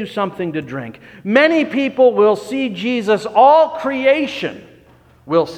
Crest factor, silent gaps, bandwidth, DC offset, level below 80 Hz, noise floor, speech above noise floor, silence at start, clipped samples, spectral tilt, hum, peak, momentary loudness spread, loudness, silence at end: 16 dB; none; 11 kHz; under 0.1%; -58 dBFS; -48 dBFS; 33 dB; 0 s; under 0.1%; -6 dB/octave; none; 0 dBFS; 15 LU; -15 LUFS; 0 s